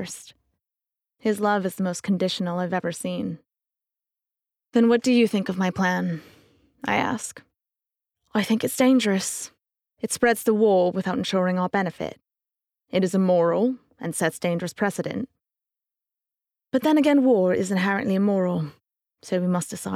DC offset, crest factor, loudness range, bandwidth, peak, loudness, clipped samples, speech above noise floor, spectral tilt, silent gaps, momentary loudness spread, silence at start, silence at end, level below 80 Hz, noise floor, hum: under 0.1%; 16 dB; 5 LU; 16 kHz; -8 dBFS; -23 LUFS; under 0.1%; 65 dB; -5.5 dB/octave; none; 14 LU; 0 s; 0 s; -68 dBFS; -87 dBFS; none